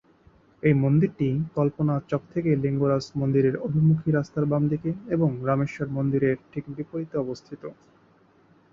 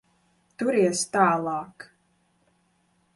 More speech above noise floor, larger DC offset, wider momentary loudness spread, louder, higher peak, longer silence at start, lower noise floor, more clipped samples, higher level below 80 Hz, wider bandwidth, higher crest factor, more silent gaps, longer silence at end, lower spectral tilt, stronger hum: second, 35 dB vs 44 dB; neither; about the same, 12 LU vs 11 LU; about the same, -25 LUFS vs -24 LUFS; about the same, -8 dBFS vs -8 dBFS; about the same, 0.65 s vs 0.6 s; second, -59 dBFS vs -68 dBFS; neither; first, -56 dBFS vs -70 dBFS; second, 7.2 kHz vs 11.5 kHz; about the same, 18 dB vs 20 dB; neither; second, 1 s vs 1.3 s; first, -9.5 dB/octave vs -4.5 dB/octave; neither